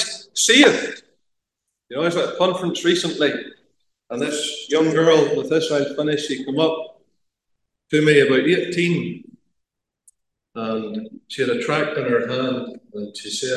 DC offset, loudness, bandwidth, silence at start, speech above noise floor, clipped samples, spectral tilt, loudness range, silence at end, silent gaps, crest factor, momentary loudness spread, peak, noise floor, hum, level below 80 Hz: under 0.1%; -19 LUFS; 12.5 kHz; 0 s; 61 dB; under 0.1%; -4 dB/octave; 5 LU; 0 s; none; 20 dB; 18 LU; 0 dBFS; -80 dBFS; none; -70 dBFS